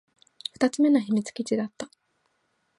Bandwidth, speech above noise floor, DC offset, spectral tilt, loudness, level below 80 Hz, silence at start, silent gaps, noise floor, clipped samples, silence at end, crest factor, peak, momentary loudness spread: 11.5 kHz; 49 dB; under 0.1%; -5 dB/octave; -25 LUFS; -74 dBFS; 0.6 s; none; -73 dBFS; under 0.1%; 0.95 s; 18 dB; -8 dBFS; 17 LU